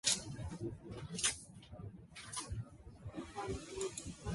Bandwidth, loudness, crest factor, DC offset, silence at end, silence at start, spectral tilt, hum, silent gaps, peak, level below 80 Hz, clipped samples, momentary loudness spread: 12 kHz; -42 LUFS; 24 dB; under 0.1%; 0 s; 0.05 s; -2.5 dB/octave; none; none; -20 dBFS; -56 dBFS; under 0.1%; 16 LU